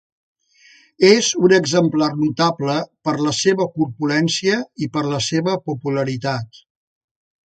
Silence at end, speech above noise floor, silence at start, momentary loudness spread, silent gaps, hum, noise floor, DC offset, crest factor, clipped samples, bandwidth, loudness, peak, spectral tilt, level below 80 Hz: 1 s; 34 dB; 1 s; 9 LU; none; none; -51 dBFS; under 0.1%; 18 dB; under 0.1%; 9.2 kHz; -18 LUFS; 0 dBFS; -4.5 dB/octave; -60 dBFS